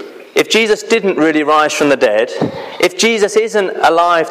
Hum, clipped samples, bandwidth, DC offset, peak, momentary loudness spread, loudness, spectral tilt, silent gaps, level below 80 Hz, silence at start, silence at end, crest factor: none; under 0.1%; 15.5 kHz; under 0.1%; 0 dBFS; 5 LU; -13 LUFS; -3 dB/octave; none; -56 dBFS; 0 s; 0 s; 12 dB